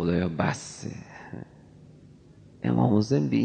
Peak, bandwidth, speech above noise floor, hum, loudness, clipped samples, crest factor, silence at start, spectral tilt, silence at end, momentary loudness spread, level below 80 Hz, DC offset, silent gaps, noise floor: -8 dBFS; 9.2 kHz; 27 dB; none; -26 LUFS; under 0.1%; 20 dB; 0 s; -7 dB/octave; 0 s; 20 LU; -56 dBFS; under 0.1%; none; -52 dBFS